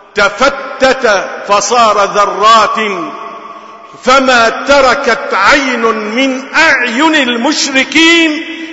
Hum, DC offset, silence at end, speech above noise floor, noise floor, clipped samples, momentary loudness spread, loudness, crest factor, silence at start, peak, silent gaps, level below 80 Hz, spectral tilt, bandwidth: none; under 0.1%; 0 s; 21 dB; -30 dBFS; 0.1%; 9 LU; -9 LUFS; 10 dB; 0.15 s; 0 dBFS; none; -42 dBFS; -2 dB/octave; 11 kHz